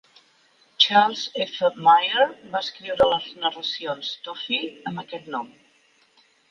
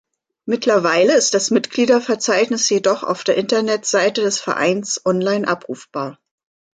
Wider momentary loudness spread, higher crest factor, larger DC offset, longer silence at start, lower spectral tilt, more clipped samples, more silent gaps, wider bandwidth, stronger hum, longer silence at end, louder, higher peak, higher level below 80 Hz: first, 16 LU vs 11 LU; first, 22 dB vs 16 dB; neither; first, 0.8 s vs 0.45 s; about the same, -3.5 dB/octave vs -3 dB/octave; neither; neither; second, 7.2 kHz vs 9.6 kHz; neither; first, 1.05 s vs 0.65 s; second, -22 LUFS vs -17 LUFS; about the same, -2 dBFS vs -2 dBFS; first, -62 dBFS vs -68 dBFS